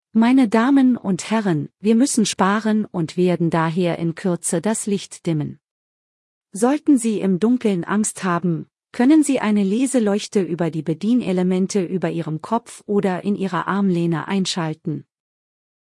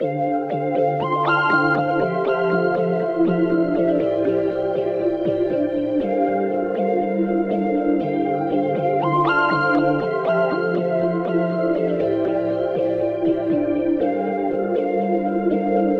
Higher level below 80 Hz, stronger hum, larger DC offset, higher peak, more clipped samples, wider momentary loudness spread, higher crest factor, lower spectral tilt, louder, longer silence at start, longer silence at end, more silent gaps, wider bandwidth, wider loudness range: second, -64 dBFS vs -54 dBFS; neither; neither; about the same, -4 dBFS vs -6 dBFS; neither; first, 9 LU vs 4 LU; about the same, 16 dB vs 14 dB; second, -5.5 dB/octave vs -9 dB/octave; about the same, -20 LUFS vs -20 LUFS; first, 0.15 s vs 0 s; first, 0.9 s vs 0 s; first, 5.71-6.41 s vs none; first, 12 kHz vs 6 kHz; about the same, 4 LU vs 2 LU